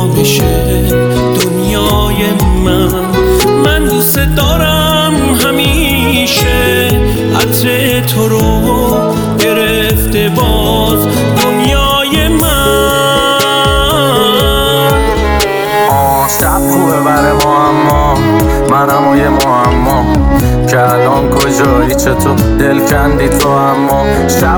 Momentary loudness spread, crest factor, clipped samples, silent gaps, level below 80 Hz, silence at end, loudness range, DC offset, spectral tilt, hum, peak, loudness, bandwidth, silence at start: 2 LU; 8 dB; under 0.1%; none; -18 dBFS; 0 s; 1 LU; under 0.1%; -4.5 dB/octave; none; 0 dBFS; -9 LUFS; over 20 kHz; 0 s